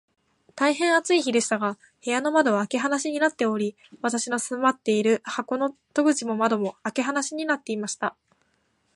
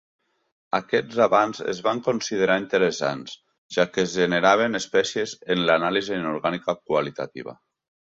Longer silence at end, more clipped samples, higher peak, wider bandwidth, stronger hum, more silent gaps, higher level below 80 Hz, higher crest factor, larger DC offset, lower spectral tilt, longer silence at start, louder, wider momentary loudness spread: first, 0.85 s vs 0.65 s; neither; about the same, -6 dBFS vs -4 dBFS; first, 11.5 kHz vs 7.8 kHz; neither; second, none vs 3.58-3.69 s; second, -78 dBFS vs -64 dBFS; about the same, 18 dB vs 20 dB; neither; about the same, -3.5 dB/octave vs -4 dB/octave; second, 0.55 s vs 0.75 s; about the same, -25 LUFS vs -23 LUFS; second, 8 LU vs 12 LU